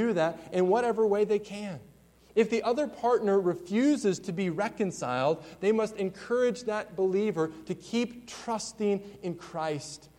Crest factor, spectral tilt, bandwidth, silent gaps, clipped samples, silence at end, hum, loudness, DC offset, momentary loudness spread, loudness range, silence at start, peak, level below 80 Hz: 16 dB; -5.5 dB/octave; 15.5 kHz; none; under 0.1%; 0.2 s; none; -29 LUFS; under 0.1%; 11 LU; 3 LU; 0 s; -12 dBFS; -66 dBFS